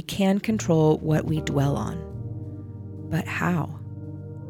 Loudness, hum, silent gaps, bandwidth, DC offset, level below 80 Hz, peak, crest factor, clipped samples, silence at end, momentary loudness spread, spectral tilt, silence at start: -25 LUFS; none; none; 17 kHz; under 0.1%; -48 dBFS; -10 dBFS; 16 dB; under 0.1%; 0 s; 17 LU; -6.5 dB/octave; 0 s